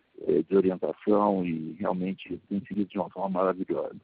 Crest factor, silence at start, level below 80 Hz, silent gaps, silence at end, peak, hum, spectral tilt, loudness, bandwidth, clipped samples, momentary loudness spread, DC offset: 18 dB; 0.2 s; -66 dBFS; none; 0.05 s; -10 dBFS; none; -7.5 dB/octave; -28 LUFS; 4.6 kHz; under 0.1%; 9 LU; under 0.1%